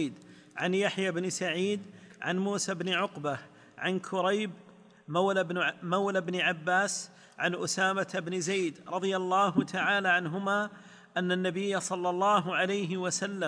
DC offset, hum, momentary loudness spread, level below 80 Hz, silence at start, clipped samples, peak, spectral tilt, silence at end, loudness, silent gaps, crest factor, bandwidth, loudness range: under 0.1%; none; 9 LU; -80 dBFS; 0 s; under 0.1%; -12 dBFS; -4 dB/octave; 0 s; -30 LUFS; none; 18 dB; 10.5 kHz; 3 LU